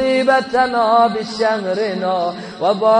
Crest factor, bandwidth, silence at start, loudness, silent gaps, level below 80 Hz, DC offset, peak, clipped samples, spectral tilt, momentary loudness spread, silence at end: 14 dB; 10 kHz; 0 s; -17 LUFS; none; -58 dBFS; under 0.1%; -2 dBFS; under 0.1%; -5 dB/octave; 7 LU; 0 s